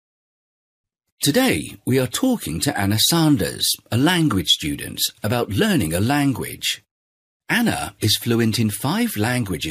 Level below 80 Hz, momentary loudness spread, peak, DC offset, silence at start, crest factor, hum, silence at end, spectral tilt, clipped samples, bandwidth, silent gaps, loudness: -48 dBFS; 6 LU; -4 dBFS; under 0.1%; 1.2 s; 16 dB; none; 0 s; -4 dB/octave; under 0.1%; 15.5 kHz; 6.91-7.40 s; -20 LUFS